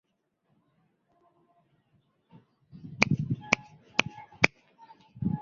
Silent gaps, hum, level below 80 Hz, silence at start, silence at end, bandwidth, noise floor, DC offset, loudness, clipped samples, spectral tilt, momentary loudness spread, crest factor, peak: none; none; -58 dBFS; 2.75 s; 0 s; 7.6 kHz; -75 dBFS; under 0.1%; -28 LUFS; under 0.1%; -4.5 dB/octave; 17 LU; 32 dB; -2 dBFS